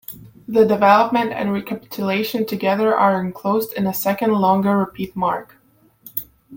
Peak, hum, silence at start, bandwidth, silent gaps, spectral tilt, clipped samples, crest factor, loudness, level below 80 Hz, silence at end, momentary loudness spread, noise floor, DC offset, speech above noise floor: -2 dBFS; none; 0.1 s; 17 kHz; none; -6 dB/octave; under 0.1%; 18 dB; -19 LUFS; -58 dBFS; 0 s; 14 LU; -48 dBFS; under 0.1%; 30 dB